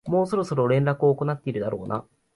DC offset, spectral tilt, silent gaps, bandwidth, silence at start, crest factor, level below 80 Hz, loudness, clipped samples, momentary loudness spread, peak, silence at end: under 0.1%; -8.5 dB/octave; none; 11.5 kHz; 0.05 s; 14 dB; -60 dBFS; -24 LUFS; under 0.1%; 9 LU; -10 dBFS; 0.35 s